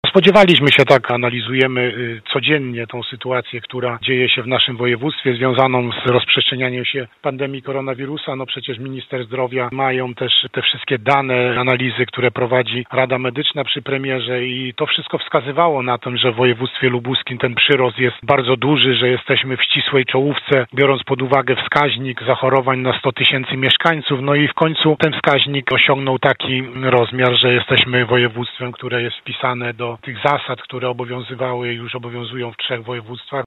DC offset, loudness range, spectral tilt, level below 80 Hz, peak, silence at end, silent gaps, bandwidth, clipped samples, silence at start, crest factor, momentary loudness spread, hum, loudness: under 0.1%; 7 LU; -6.5 dB/octave; -56 dBFS; 0 dBFS; 0 s; none; 9.6 kHz; under 0.1%; 0.05 s; 16 dB; 11 LU; none; -16 LUFS